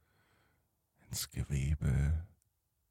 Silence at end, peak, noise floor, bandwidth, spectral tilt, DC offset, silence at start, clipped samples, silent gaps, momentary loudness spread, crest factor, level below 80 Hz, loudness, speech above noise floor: 0.65 s; -22 dBFS; -79 dBFS; 16.5 kHz; -5 dB/octave; under 0.1%; 1.1 s; under 0.1%; none; 9 LU; 16 dB; -42 dBFS; -36 LUFS; 46 dB